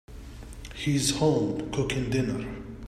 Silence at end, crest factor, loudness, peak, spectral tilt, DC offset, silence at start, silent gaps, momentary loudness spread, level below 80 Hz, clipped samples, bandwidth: 0 s; 18 dB; -27 LUFS; -10 dBFS; -5 dB/octave; under 0.1%; 0.1 s; none; 20 LU; -44 dBFS; under 0.1%; 15.5 kHz